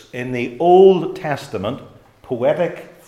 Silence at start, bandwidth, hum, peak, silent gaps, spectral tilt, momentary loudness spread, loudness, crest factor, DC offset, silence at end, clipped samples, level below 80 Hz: 0.15 s; 11 kHz; none; 0 dBFS; none; -7.5 dB/octave; 16 LU; -17 LUFS; 18 dB; under 0.1%; 0.2 s; under 0.1%; -54 dBFS